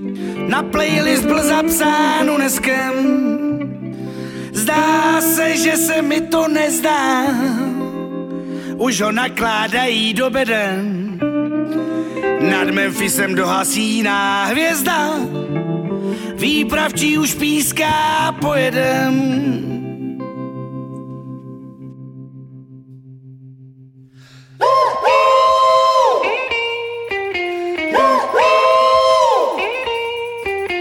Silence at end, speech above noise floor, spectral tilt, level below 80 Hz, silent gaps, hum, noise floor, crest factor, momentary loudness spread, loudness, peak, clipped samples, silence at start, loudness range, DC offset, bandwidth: 0 s; 27 dB; -3.5 dB/octave; -50 dBFS; none; none; -43 dBFS; 16 dB; 14 LU; -16 LUFS; -2 dBFS; under 0.1%; 0 s; 7 LU; under 0.1%; 17.5 kHz